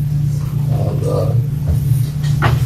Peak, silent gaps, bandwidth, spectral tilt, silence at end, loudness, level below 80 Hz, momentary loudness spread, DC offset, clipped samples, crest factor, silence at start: -2 dBFS; none; 14.5 kHz; -7.5 dB/octave; 0 s; -17 LUFS; -28 dBFS; 2 LU; under 0.1%; under 0.1%; 14 dB; 0 s